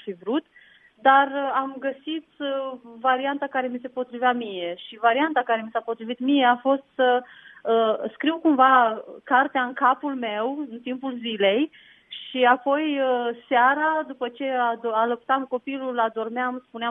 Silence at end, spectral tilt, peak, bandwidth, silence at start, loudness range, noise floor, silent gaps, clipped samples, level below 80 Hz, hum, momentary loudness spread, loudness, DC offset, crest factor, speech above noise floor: 0 s; -7 dB/octave; -4 dBFS; 3.9 kHz; 0.05 s; 4 LU; -54 dBFS; none; under 0.1%; -78 dBFS; none; 12 LU; -23 LUFS; under 0.1%; 20 dB; 31 dB